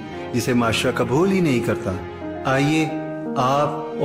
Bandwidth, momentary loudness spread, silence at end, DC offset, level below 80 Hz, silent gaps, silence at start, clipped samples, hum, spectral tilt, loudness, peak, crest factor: 16 kHz; 9 LU; 0 s; under 0.1%; -50 dBFS; none; 0 s; under 0.1%; none; -5.5 dB/octave; -21 LUFS; -10 dBFS; 12 dB